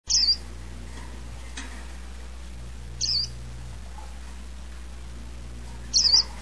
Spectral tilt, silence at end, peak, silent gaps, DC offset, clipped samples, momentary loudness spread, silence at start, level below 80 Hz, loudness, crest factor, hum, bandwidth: -0.5 dB/octave; 0 s; -8 dBFS; none; 0.8%; under 0.1%; 22 LU; 0 s; -40 dBFS; -21 LUFS; 20 dB; none; 11 kHz